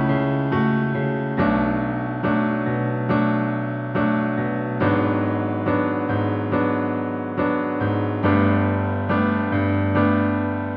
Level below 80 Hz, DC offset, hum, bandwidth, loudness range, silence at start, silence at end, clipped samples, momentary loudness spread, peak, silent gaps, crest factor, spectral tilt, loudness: -48 dBFS; under 0.1%; none; 5 kHz; 2 LU; 0 s; 0 s; under 0.1%; 4 LU; -6 dBFS; none; 14 dB; -11 dB/octave; -22 LUFS